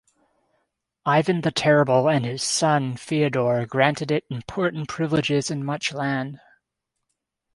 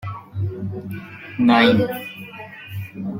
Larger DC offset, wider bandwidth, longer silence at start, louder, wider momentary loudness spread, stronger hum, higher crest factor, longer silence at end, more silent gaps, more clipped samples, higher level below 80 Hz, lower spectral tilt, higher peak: neither; second, 11.5 kHz vs 16.5 kHz; first, 1.05 s vs 0 s; second, -22 LUFS vs -19 LUFS; second, 8 LU vs 20 LU; neither; about the same, 22 dB vs 20 dB; first, 1.2 s vs 0 s; neither; neither; about the same, -60 dBFS vs -58 dBFS; second, -5 dB/octave vs -7 dB/octave; about the same, -2 dBFS vs -2 dBFS